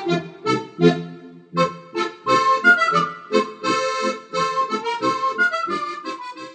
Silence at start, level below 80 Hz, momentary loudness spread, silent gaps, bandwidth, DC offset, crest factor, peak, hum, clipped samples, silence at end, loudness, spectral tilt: 0 s; -72 dBFS; 13 LU; none; 9.4 kHz; under 0.1%; 18 dB; -2 dBFS; none; under 0.1%; 0 s; -20 LUFS; -5 dB/octave